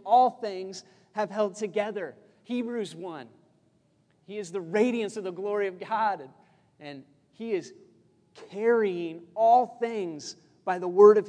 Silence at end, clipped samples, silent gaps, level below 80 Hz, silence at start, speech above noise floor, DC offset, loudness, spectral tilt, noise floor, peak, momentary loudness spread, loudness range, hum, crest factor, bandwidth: 0 s; under 0.1%; none; -86 dBFS; 0.05 s; 40 dB; under 0.1%; -27 LUFS; -5.5 dB/octave; -67 dBFS; -4 dBFS; 20 LU; 6 LU; none; 24 dB; 10 kHz